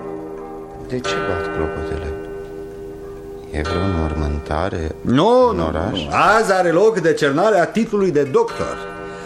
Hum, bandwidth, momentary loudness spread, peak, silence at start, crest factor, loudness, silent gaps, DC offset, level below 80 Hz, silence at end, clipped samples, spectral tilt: none; 13.5 kHz; 18 LU; -2 dBFS; 0 s; 16 dB; -18 LUFS; none; under 0.1%; -34 dBFS; 0 s; under 0.1%; -6 dB/octave